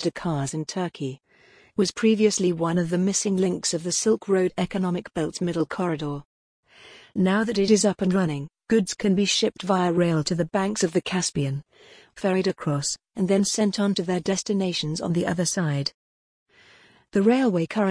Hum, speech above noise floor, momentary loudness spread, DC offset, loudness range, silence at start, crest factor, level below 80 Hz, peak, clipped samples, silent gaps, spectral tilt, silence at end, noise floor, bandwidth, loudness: none; 33 dB; 8 LU; under 0.1%; 3 LU; 0 s; 18 dB; -58 dBFS; -6 dBFS; under 0.1%; 6.25-6.63 s, 15.94-16.46 s; -5 dB/octave; 0 s; -56 dBFS; 10.5 kHz; -24 LUFS